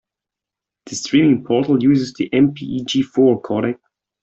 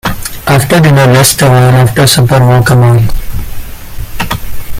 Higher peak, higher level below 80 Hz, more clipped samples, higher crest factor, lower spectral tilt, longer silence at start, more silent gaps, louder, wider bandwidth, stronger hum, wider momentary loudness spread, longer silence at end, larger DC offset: about the same, -2 dBFS vs 0 dBFS; second, -56 dBFS vs -22 dBFS; second, under 0.1% vs 0.2%; first, 16 dB vs 6 dB; about the same, -6 dB/octave vs -5 dB/octave; first, 0.85 s vs 0.05 s; neither; second, -17 LUFS vs -7 LUFS; second, 8 kHz vs 16.5 kHz; neither; second, 11 LU vs 18 LU; first, 0.5 s vs 0 s; neither